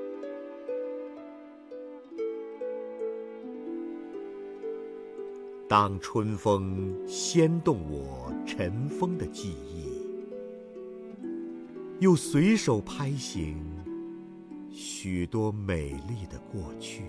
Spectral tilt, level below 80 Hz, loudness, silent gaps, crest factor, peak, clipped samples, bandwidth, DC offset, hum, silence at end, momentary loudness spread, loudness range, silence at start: -6 dB/octave; -52 dBFS; -31 LUFS; none; 24 dB; -8 dBFS; under 0.1%; 11 kHz; under 0.1%; none; 0 s; 18 LU; 10 LU; 0 s